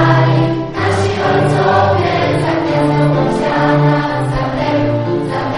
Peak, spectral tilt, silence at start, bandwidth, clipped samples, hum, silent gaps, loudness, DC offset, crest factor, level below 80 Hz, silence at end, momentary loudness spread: -2 dBFS; -7 dB/octave; 0 s; 11.5 kHz; under 0.1%; none; none; -14 LUFS; under 0.1%; 12 dB; -36 dBFS; 0 s; 5 LU